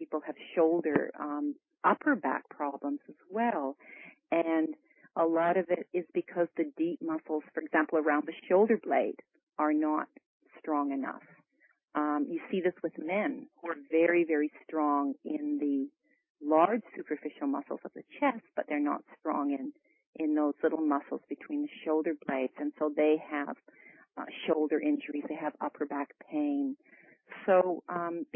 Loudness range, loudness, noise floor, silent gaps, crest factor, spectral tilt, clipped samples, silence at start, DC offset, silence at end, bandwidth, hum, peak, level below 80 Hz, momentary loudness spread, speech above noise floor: 4 LU; -32 LUFS; -68 dBFS; 9.43-9.47 s, 10.26-10.40 s, 16.30-16.35 s, 20.06-20.13 s; 20 dB; -9.5 dB/octave; under 0.1%; 0 s; under 0.1%; 0.1 s; 3.5 kHz; none; -12 dBFS; -84 dBFS; 13 LU; 37 dB